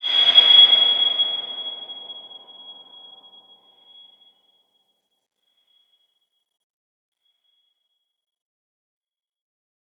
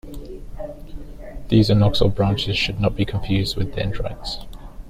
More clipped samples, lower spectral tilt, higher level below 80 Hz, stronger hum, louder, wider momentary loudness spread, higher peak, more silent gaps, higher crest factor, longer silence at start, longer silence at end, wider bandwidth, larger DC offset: neither; second, 0 dB/octave vs -6.5 dB/octave; second, -90 dBFS vs -32 dBFS; neither; first, -12 LUFS vs -21 LUFS; first, 25 LU vs 22 LU; about the same, -2 dBFS vs -4 dBFS; neither; about the same, 22 dB vs 18 dB; about the same, 0.05 s vs 0.05 s; first, 7.25 s vs 0 s; second, 7.8 kHz vs 14.5 kHz; neither